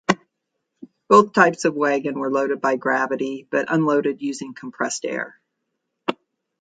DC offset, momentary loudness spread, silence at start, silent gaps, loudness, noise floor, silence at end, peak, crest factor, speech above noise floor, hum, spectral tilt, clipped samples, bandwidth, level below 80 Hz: under 0.1%; 14 LU; 0.1 s; none; -21 LUFS; -78 dBFS; 0.5 s; 0 dBFS; 22 dB; 58 dB; none; -5 dB/octave; under 0.1%; 9.4 kHz; -72 dBFS